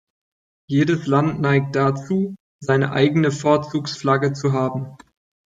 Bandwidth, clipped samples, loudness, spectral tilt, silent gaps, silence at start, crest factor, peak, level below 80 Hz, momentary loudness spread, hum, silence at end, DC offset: 7.8 kHz; under 0.1%; -20 LUFS; -7 dB/octave; 2.40-2.59 s; 0.7 s; 18 dB; -4 dBFS; -58 dBFS; 8 LU; none; 0.5 s; under 0.1%